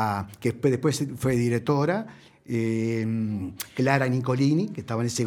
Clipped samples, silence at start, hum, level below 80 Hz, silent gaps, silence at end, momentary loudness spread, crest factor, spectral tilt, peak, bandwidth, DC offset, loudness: under 0.1%; 0 s; none; -58 dBFS; none; 0 s; 7 LU; 20 dB; -6.5 dB/octave; -6 dBFS; 18.5 kHz; under 0.1%; -26 LUFS